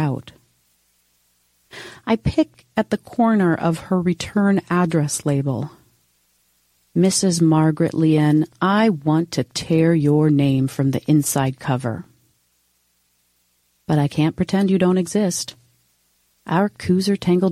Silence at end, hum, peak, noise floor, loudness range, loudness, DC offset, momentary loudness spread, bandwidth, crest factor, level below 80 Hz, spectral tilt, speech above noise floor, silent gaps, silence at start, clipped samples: 0 s; 60 Hz at -45 dBFS; -6 dBFS; -65 dBFS; 6 LU; -19 LUFS; under 0.1%; 9 LU; 14.5 kHz; 14 dB; -48 dBFS; -6 dB/octave; 47 dB; none; 0 s; under 0.1%